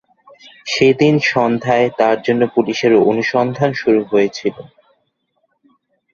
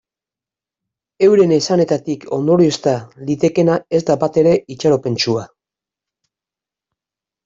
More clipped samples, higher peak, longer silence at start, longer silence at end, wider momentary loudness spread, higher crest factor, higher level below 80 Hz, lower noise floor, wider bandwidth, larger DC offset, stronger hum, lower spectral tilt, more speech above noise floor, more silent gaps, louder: neither; about the same, -2 dBFS vs -2 dBFS; second, 0.65 s vs 1.2 s; second, 1.5 s vs 2 s; about the same, 6 LU vs 7 LU; about the same, 14 dB vs 14 dB; about the same, -58 dBFS vs -56 dBFS; second, -66 dBFS vs -89 dBFS; about the same, 7.4 kHz vs 7.8 kHz; neither; neither; about the same, -6 dB/octave vs -6 dB/octave; second, 52 dB vs 74 dB; neither; about the same, -15 LUFS vs -16 LUFS